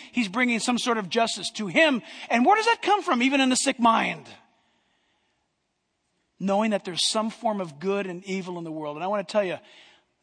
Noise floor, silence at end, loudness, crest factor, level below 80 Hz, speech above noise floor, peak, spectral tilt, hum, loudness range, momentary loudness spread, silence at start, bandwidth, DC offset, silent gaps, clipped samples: -76 dBFS; 0.65 s; -24 LUFS; 20 dB; -76 dBFS; 52 dB; -6 dBFS; -3.5 dB/octave; none; 7 LU; 11 LU; 0 s; 10.5 kHz; under 0.1%; none; under 0.1%